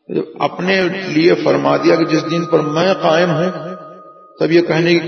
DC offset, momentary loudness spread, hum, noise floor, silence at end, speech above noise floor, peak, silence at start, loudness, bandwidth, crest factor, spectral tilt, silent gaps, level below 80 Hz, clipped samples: under 0.1%; 8 LU; none; -39 dBFS; 0 s; 25 dB; 0 dBFS; 0.1 s; -15 LUFS; 6.6 kHz; 14 dB; -6 dB/octave; none; -62 dBFS; under 0.1%